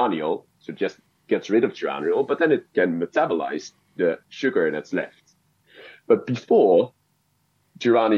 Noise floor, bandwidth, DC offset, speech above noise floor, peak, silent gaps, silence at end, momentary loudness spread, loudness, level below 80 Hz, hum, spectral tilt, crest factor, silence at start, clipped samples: -68 dBFS; 7.2 kHz; under 0.1%; 46 dB; -6 dBFS; none; 0 s; 11 LU; -23 LUFS; -78 dBFS; none; -6.5 dB/octave; 18 dB; 0 s; under 0.1%